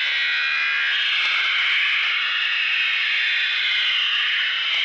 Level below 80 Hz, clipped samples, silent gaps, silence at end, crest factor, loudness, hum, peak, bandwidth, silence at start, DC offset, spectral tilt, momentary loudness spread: -72 dBFS; under 0.1%; none; 0 s; 10 dB; -18 LUFS; none; -12 dBFS; 9.8 kHz; 0 s; under 0.1%; 3.5 dB/octave; 2 LU